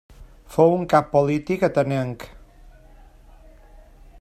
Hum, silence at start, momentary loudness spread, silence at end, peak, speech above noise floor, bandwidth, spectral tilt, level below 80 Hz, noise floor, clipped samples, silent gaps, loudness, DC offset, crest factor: none; 0.2 s; 13 LU; 1.95 s; -2 dBFS; 28 dB; 15 kHz; -7.5 dB/octave; -48 dBFS; -48 dBFS; under 0.1%; none; -21 LUFS; under 0.1%; 20 dB